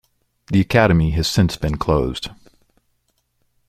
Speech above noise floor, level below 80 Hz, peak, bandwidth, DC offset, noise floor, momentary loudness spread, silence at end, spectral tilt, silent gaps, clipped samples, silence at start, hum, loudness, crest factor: 51 dB; -34 dBFS; 0 dBFS; 15.5 kHz; under 0.1%; -68 dBFS; 10 LU; 1.35 s; -6 dB/octave; none; under 0.1%; 0.5 s; none; -18 LUFS; 20 dB